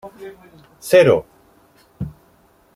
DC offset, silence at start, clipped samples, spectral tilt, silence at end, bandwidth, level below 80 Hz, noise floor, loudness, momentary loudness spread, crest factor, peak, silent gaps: under 0.1%; 0.05 s; under 0.1%; -5.5 dB/octave; 0.65 s; 15.5 kHz; -50 dBFS; -55 dBFS; -15 LUFS; 25 LU; 18 dB; -2 dBFS; none